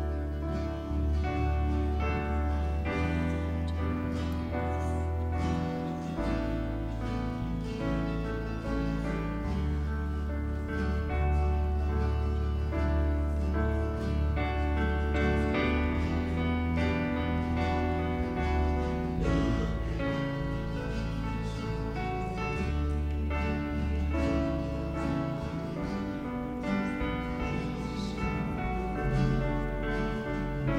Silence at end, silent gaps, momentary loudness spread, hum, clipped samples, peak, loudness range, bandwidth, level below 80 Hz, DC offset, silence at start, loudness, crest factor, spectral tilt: 0 s; none; 5 LU; none; under 0.1%; -16 dBFS; 4 LU; 8.6 kHz; -34 dBFS; under 0.1%; 0 s; -31 LUFS; 14 dB; -8 dB/octave